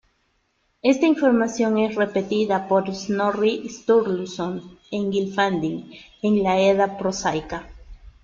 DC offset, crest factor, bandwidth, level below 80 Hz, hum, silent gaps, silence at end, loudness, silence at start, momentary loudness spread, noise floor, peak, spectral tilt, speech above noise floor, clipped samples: under 0.1%; 16 dB; 7.6 kHz; -52 dBFS; none; none; 0.15 s; -22 LUFS; 0.85 s; 11 LU; -68 dBFS; -6 dBFS; -5.5 dB/octave; 47 dB; under 0.1%